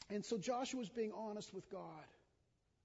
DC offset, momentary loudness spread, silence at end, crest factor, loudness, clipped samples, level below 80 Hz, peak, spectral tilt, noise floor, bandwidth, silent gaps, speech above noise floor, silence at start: under 0.1%; 14 LU; 0.7 s; 16 dB; -45 LUFS; under 0.1%; -80 dBFS; -30 dBFS; -4.5 dB/octave; -81 dBFS; 7.6 kHz; none; 36 dB; 0 s